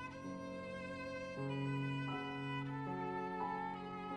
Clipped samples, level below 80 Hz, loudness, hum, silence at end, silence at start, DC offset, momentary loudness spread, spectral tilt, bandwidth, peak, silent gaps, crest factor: under 0.1%; -70 dBFS; -43 LUFS; none; 0 s; 0 s; under 0.1%; 6 LU; -7 dB/octave; 10 kHz; -30 dBFS; none; 14 dB